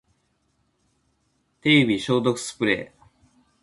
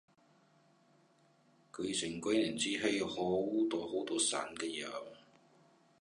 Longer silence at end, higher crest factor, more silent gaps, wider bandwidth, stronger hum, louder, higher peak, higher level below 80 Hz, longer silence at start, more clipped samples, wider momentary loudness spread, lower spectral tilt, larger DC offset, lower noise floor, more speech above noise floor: about the same, 0.75 s vs 0.85 s; about the same, 22 dB vs 20 dB; neither; about the same, 11.5 kHz vs 11.5 kHz; neither; first, -22 LUFS vs -36 LUFS; first, -4 dBFS vs -18 dBFS; first, -60 dBFS vs -72 dBFS; about the same, 1.65 s vs 1.75 s; neither; about the same, 9 LU vs 10 LU; first, -5 dB/octave vs -3 dB/octave; neither; about the same, -69 dBFS vs -69 dBFS; first, 48 dB vs 33 dB